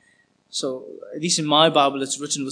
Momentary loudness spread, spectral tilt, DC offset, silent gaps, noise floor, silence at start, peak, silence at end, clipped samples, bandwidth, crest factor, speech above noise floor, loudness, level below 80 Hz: 15 LU; -3 dB/octave; under 0.1%; none; -61 dBFS; 0.55 s; -2 dBFS; 0 s; under 0.1%; 10.5 kHz; 20 dB; 40 dB; -20 LUFS; -80 dBFS